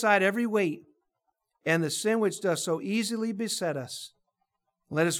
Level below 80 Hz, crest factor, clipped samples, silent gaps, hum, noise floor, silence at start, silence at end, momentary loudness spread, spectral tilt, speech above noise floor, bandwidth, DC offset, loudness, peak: -82 dBFS; 20 dB; under 0.1%; none; none; -80 dBFS; 0 s; 0 s; 11 LU; -4 dB/octave; 53 dB; 17.5 kHz; under 0.1%; -28 LUFS; -10 dBFS